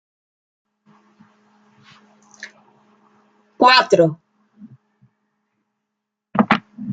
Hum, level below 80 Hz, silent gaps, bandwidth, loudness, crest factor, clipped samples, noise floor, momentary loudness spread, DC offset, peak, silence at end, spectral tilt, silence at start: none; -66 dBFS; none; 9.2 kHz; -16 LUFS; 22 dB; under 0.1%; -81 dBFS; 27 LU; under 0.1%; 0 dBFS; 0 s; -5 dB/octave; 2.4 s